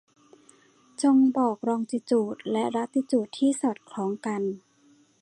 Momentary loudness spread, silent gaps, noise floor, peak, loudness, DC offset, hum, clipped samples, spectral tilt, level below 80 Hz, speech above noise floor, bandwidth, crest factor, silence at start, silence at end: 11 LU; none; -61 dBFS; -12 dBFS; -26 LUFS; under 0.1%; none; under 0.1%; -5.5 dB/octave; -78 dBFS; 36 dB; 11.5 kHz; 16 dB; 1 s; 0.65 s